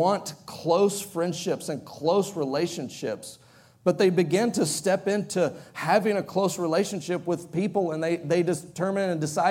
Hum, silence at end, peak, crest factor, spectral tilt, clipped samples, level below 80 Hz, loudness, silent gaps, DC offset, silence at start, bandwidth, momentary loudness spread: none; 0 s; -8 dBFS; 18 dB; -5 dB/octave; under 0.1%; -70 dBFS; -26 LUFS; none; under 0.1%; 0 s; 17 kHz; 10 LU